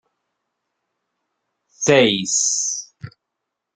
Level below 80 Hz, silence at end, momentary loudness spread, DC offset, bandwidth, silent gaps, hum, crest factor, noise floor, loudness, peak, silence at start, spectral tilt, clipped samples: -64 dBFS; 0.65 s; 12 LU; under 0.1%; 10.5 kHz; none; none; 22 dB; -80 dBFS; -17 LUFS; -2 dBFS; 1.8 s; -2.5 dB/octave; under 0.1%